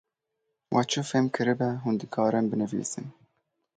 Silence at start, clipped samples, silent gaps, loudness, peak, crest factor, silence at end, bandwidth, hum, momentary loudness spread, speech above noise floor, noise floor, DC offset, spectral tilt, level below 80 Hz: 0.7 s; under 0.1%; none; -28 LUFS; -10 dBFS; 18 dB; 0.65 s; 9.4 kHz; none; 8 LU; 54 dB; -81 dBFS; under 0.1%; -5 dB/octave; -68 dBFS